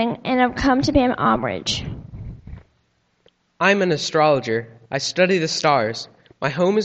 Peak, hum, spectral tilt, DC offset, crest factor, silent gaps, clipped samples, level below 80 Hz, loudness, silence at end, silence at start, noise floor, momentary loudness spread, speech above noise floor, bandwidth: -2 dBFS; none; -4.5 dB/octave; under 0.1%; 18 dB; none; under 0.1%; -42 dBFS; -19 LUFS; 0 s; 0 s; -65 dBFS; 17 LU; 46 dB; 8.6 kHz